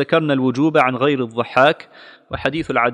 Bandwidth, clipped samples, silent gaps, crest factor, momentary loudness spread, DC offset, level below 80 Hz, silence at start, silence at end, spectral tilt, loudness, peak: 10.5 kHz; under 0.1%; none; 16 dB; 8 LU; under 0.1%; -50 dBFS; 0 s; 0 s; -6.5 dB/octave; -17 LUFS; 0 dBFS